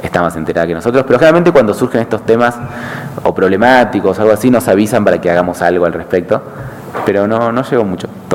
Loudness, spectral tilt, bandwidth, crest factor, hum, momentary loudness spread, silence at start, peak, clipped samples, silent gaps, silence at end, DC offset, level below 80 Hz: -11 LUFS; -6.5 dB/octave; 17 kHz; 12 dB; none; 11 LU; 0 s; 0 dBFS; 0.5%; none; 0 s; under 0.1%; -44 dBFS